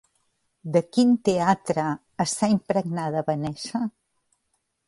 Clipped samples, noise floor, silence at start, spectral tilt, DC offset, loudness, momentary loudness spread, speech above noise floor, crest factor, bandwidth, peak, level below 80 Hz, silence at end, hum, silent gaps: under 0.1%; -75 dBFS; 0.65 s; -5.5 dB/octave; under 0.1%; -24 LUFS; 9 LU; 51 dB; 18 dB; 11.5 kHz; -6 dBFS; -64 dBFS; 1 s; none; none